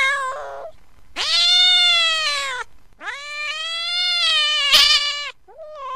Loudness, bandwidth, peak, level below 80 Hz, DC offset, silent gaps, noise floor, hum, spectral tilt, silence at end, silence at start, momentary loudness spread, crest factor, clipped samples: -15 LUFS; 16 kHz; 0 dBFS; -52 dBFS; 0.8%; none; -44 dBFS; none; 2.5 dB/octave; 0 s; 0 s; 22 LU; 20 dB; under 0.1%